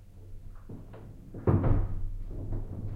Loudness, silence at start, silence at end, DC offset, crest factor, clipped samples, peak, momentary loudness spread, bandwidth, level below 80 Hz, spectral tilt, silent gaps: -32 LUFS; 0 s; 0 s; under 0.1%; 18 dB; under 0.1%; -12 dBFS; 23 LU; 3.1 kHz; -36 dBFS; -11 dB/octave; none